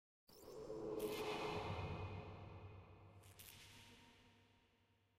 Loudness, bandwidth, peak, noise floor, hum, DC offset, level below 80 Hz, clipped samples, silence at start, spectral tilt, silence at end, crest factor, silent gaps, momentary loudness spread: -50 LUFS; 16 kHz; -34 dBFS; -78 dBFS; none; under 0.1%; -68 dBFS; under 0.1%; 0.3 s; -5.5 dB/octave; 0.6 s; 18 dB; none; 19 LU